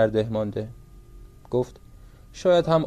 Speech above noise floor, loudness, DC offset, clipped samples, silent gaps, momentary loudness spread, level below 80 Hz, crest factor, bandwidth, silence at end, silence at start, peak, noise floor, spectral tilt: 24 dB; -25 LUFS; under 0.1%; under 0.1%; none; 15 LU; -48 dBFS; 18 dB; 10 kHz; 0 s; 0 s; -8 dBFS; -47 dBFS; -7 dB/octave